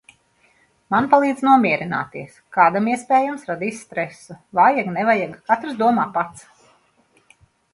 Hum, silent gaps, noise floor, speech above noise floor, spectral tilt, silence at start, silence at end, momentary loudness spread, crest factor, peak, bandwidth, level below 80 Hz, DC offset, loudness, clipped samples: none; none; -60 dBFS; 41 dB; -6 dB/octave; 0.9 s; 1.35 s; 12 LU; 20 dB; 0 dBFS; 11.5 kHz; -64 dBFS; under 0.1%; -19 LUFS; under 0.1%